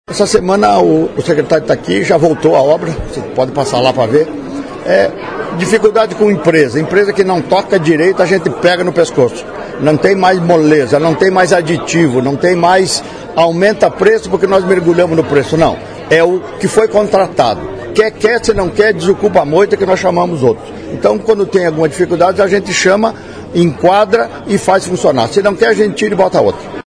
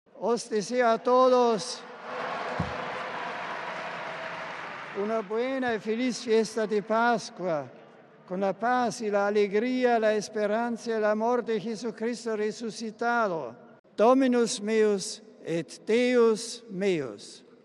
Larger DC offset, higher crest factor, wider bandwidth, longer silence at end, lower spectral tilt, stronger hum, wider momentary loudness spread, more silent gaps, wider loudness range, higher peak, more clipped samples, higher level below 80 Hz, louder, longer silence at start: neither; second, 10 dB vs 18 dB; about the same, 11 kHz vs 12 kHz; second, 0.05 s vs 0.25 s; about the same, -5.5 dB/octave vs -4.5 dB/octave; neither; second, 6 LU vs 13 LU; second, none vs 13.79-13.84 s; second, 2 LU vs 6 LU; first, 0 dBFS vs -10 dBFS; first, 0.4% vs under 0.1%; first, -40 dBFS vs -66 dBFS; first, -11 LUFS vs -27 LUFS; about the same, 0.1 s vs 0.15 s